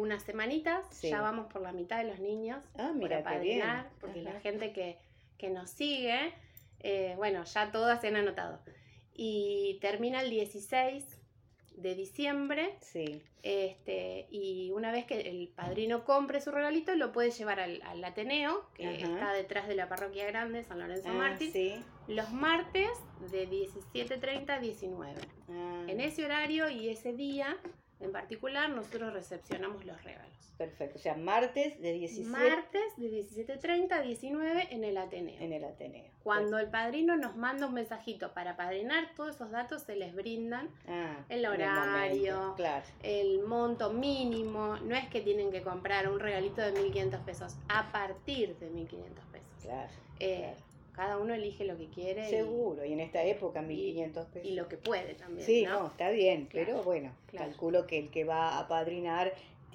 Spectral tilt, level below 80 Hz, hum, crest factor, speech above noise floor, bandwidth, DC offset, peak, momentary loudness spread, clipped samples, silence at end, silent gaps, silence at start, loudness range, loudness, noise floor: -5 dB/octave; -64 dBFS; none; 20 dB; 29 dB; 16.5 kHz; under 0.1%; -16 dBFS; 12 LU; under 0.1%; 0 s; none; 0 s; 5 LU; -35 LUFS; -65 dBFS